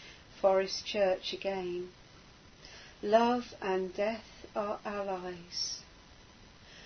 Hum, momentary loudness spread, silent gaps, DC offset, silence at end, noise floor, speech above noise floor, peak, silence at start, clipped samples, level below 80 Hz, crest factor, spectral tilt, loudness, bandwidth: none; 21 LU; none; under 0.1%; 0 s; -56 dBFS; 24 dB; -12 dBFS; 0 s; under 0.1%; -62 dBFS; 22 dB; -4 dB/octave; -33 LUFS; 6.6 kHz